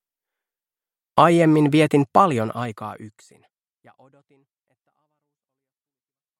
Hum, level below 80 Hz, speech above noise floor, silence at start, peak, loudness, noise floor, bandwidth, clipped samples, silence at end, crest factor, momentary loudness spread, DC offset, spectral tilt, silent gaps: none; -66 dBFS; over 70 dB; 1.15 s; 0 dBFS; -18 LUFS; under -90 dBFS; 13.5 kHz; under 0.1%; 3.3 s; 22 dB; 19 LU; under 0.1%; -7 dB/octave; none